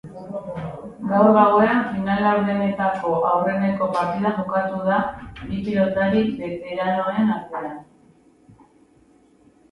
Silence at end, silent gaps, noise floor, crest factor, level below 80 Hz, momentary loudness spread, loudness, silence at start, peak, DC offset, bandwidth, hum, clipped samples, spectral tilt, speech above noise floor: 1.9 s; none; -55 dBFS; 18 dB; -52 dBFS; 16 LU; -21 LUFS; 0.05 s; -2 dBFS; under 0.1%; 10.5 kHz; none; under 0.1%; -8.5 dB/octave; 35 dB